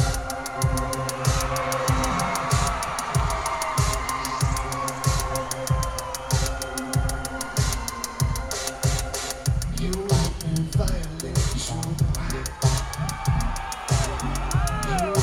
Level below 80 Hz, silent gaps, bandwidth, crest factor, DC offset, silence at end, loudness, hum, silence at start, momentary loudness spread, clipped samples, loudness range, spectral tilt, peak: -30 dBFS; none; 18 kHz; 18 dB; under 0.1%; 0 s; -25 LUFS; none; 0 s; 5 LU; under 0.1%; 2 LU; -4.5 dB/octave; -6 dBFS